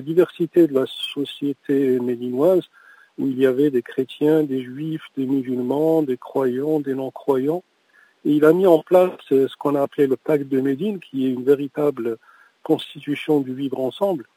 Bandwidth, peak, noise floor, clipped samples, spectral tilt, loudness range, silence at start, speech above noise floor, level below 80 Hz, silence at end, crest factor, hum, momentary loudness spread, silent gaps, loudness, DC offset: 16 kHz; -2 dBFS; -57 dBFS; under 0.1%; -7.5 dB/octave; 4 LU; 0 s; 37 dB; -76 dBFS; 0.15 s; 18 dB; none; 10 LU; none; -21 LUFS; under 0.1%